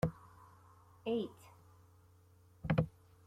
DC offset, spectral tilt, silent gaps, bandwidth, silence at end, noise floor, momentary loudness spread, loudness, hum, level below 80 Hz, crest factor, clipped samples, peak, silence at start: under 0.1%; -8 dB/octave; none; 14.5 kHz; 0.35 s; -65 dBFS; 25 LU; -39 LUFS; none; -60 dBFS; 24 dB; under 0.1%; -18 dBFS; 0.05 s